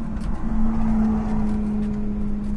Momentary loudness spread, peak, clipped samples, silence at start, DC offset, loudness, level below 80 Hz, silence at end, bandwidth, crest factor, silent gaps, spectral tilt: 6 LU; -10 dBFS; under 0.1%; 0 s; under 0.1%; -24 LUFS; -26 dBFS; 0 s; 5.6 kHz; 10 dB; none; -9 dB/octave